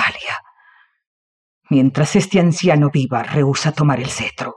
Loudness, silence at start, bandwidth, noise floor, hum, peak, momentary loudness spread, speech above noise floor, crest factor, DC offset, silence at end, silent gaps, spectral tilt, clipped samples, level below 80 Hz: -16 LUFS; 0 s; 11 kHz; -53 dBFS; none; -2 dBFS; 8 LU; 37 dB; 14 dB; under 0.1%; 0 s; 1.07-1.61 s; -6 dB/octave; under 0.1%; -54 dBFS